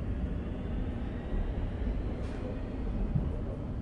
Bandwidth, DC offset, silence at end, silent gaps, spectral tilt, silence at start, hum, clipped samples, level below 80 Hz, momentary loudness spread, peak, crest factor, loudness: 5.8 kHz; under 0.1%; 0 s; none; -9 dB/octave; 0 s; none; under 0.1%; -36 dBFS; 4 LU; -18 dBFS; 16 dB; -36 LUFS